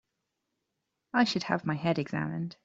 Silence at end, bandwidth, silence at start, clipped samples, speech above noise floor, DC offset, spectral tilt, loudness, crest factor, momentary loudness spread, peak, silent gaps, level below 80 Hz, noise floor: 0.1 s; 7.8 kHz; 1.15 s; under 0.1%; 54 dB; under 0.1%; -6 dB/octave; -30 LUFS; 22 dB; 6 LU; -10 dBFS; none; -70 dBFS; -84 dBFS